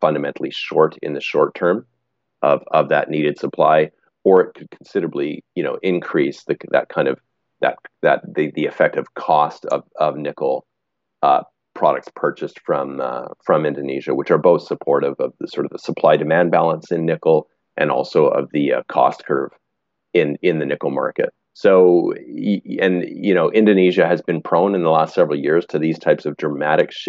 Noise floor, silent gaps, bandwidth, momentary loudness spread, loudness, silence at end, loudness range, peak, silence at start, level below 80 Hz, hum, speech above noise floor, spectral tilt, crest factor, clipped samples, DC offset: -78 dBFS; none; 7.6 kHz; 10 LU; -18 LUFS; 0 s; 4 LU; -2 dBFS; 0 s; -74 dBFS; none; 61 dB; -5 dB/octave; 16 dB; under 0.1%; under 0.1%